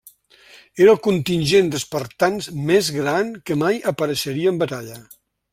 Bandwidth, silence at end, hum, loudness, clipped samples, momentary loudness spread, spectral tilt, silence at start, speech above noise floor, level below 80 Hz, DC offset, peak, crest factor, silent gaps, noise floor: 16 kHz; 0.5 s; none; -19 LUFS; under 0.1%; 10 LU; -5 dB/octave; 0.55 s; 30 dB; -56 dBFS; under 0.1%; -2 dBFS; 18 dB; none; -49 dBFS